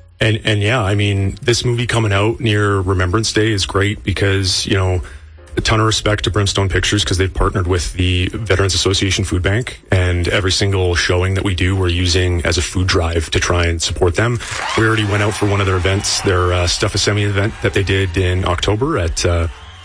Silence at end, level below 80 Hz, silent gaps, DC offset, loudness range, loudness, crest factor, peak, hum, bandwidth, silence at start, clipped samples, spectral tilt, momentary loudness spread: 0 s; -30 dBFS; none; under 0.1%; 1 LU; -16 LUFS; 12 dB; -4 dBFS; none; 10.5 kHz; 0.2 s; under 0.1%; -4.5 dB/octave; 3 LU